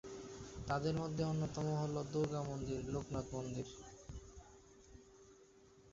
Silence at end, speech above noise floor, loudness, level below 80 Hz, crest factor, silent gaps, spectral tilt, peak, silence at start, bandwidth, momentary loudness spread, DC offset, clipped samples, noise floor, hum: 0 s; 25 dB; -41 LUFS; -60 dBFS; 18 dB; none; -7 dB/octave; -24 dBFS; 0.05 s; 7.8 kHz; 23 LU; under 0.1%; under 0.1%; -65 dBFS; none